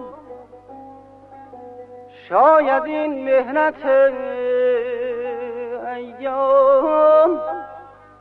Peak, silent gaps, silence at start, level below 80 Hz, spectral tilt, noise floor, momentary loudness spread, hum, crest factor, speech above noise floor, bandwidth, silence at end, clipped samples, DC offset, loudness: -4 dBFS; none; 0 s; -62 dBFS; -6.5 dB/octave; -42 dBFS; 22 LU; 50 Hz at -60 dBFS; 16 dB; 26 dB; 4.3 kHz; 0.3 s; under 0.1%; under 0.1%; -18 LUFS